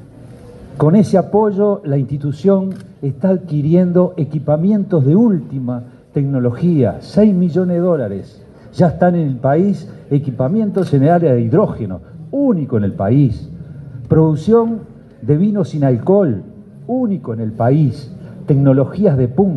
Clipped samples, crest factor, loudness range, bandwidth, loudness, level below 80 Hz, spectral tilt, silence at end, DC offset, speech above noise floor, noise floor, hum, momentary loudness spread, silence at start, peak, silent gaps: under 0.1%; 14 dB; 1 LU; 9.2 kHz; -15 LUFS; -46 dBFS; -10 dB/octave; 0 s; under 0.1%; 23 dB; -37 dBFS; none; 13 LU; 0.2 s; 0 dBFS; none